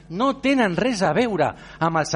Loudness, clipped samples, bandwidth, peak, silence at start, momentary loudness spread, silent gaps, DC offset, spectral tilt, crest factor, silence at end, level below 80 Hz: -21 LUFS; under 0.1%; 10.5 kHz; -8 dBFS; 0.1 s; 5 LU; none; under 0.1%; -5 dB/octave; 14 dB; 0 s; -50 dBFS